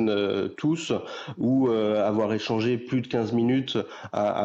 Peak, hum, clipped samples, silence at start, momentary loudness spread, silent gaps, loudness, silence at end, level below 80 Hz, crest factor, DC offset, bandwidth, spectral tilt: -14 dBFS; none; under 0.1%; 0 s; 7 LU; none; -26 LUFS; 0 s; -70 dBFS; 12 dB; under 0.1%; 8 kHz; -6.5 dB/octave